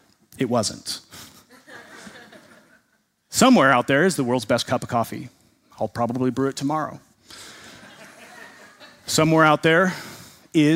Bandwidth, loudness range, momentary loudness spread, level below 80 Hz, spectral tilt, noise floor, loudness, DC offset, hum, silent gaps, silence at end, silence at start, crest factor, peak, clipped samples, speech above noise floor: 16 kHz; 8 LU; 26 LU; -60 dBFS; -4.5 dB/octave; -67 dBFS; -21 LUFS; under 0.1%; none; none; 0 s; 0.4 s; 22 dB; -2 dBFS; under 0.1%; 47 dB